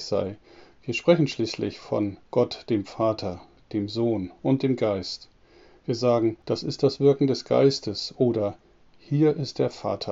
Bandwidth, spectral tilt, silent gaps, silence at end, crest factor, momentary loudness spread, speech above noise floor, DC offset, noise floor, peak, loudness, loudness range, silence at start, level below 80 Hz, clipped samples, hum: 7.8 kHz; -6 dB/octave; none; 0 s; 20 dB; 11 LU; 30 dB; under 0.1%; -54 dBFS; -6 dBFS; -25 LUFS; 4 LU; 0 s; -60 dBFS; under 0.1%; none